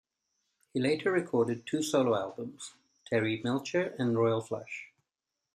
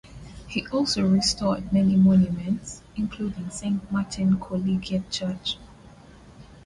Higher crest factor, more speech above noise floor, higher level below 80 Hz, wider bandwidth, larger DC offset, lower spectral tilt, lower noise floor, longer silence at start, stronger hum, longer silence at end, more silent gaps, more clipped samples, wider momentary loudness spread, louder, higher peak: about the same, 18 dB vs 14 dB; first, 57 dB vs 25 dB; second, -76 dBFS vs -48 dBFS; first, 14 kHz vs 11.5 kHz; neither; about the same, -5.5 dB/octave vs -5.5 dB/octave; first, -88 dBFS vs -48 dBFS; first, 0.75 s vs 0.05 s; neither; first, 0.7 s vs 0.05 s; neither; neither; about the same, 14 LU vs 13 LU; second, -31 LUFS vs -24 LUFS; second, -14 dBFS vs -10 dBFS